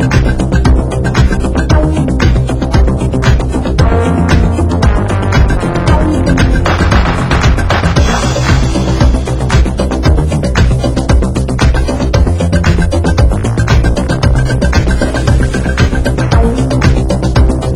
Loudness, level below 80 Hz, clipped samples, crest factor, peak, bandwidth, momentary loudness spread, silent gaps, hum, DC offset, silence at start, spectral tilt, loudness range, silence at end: -11 LUFS; -12 dBFS; 0.2%; 10 dB; 0 dBFS; 11.5 kHz; 2 LU; none; none; under 0.1%; 0 s; -6.5 dB/octave; 1 LU; 0 s